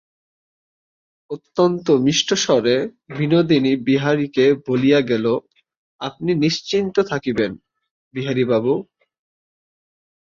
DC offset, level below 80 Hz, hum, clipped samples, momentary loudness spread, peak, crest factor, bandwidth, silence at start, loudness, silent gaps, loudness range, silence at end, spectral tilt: under 0.1%; -58 dBFS; none; under 0.1%; 11 LU; -2 dBFS; 16 dB; 7.4 kHz; 1.3 s; -19 LUFS; 5.77-5.99 s, 7.91-8.11 s; 5 LU; 1.4 s; -5 dB/octave